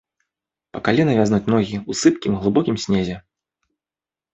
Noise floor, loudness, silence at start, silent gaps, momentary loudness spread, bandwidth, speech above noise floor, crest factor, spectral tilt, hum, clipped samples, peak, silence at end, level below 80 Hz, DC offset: under -90 dBFS; -19 LUFS; 0.75 s; none; 9 LU; 8.4 kHz; over 72 dB; 18 dB; -6 dB/octave; none; under 0.1%; -2 dBFS; 1.15 s; -48 dBFS; under 0.1%